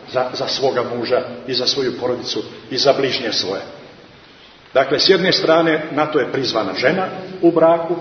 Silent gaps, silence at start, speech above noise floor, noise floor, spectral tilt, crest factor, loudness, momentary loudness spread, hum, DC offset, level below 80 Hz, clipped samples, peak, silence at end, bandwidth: none; 0 s; 27 dB; -44 dBFS; -4.5 dB/octave; 18 dB; -17 LUFS; 9 LU; none; under 0.1%; -60 dBFS; under 0.1%; 0 dBFS; 0 s; 6.6 kHz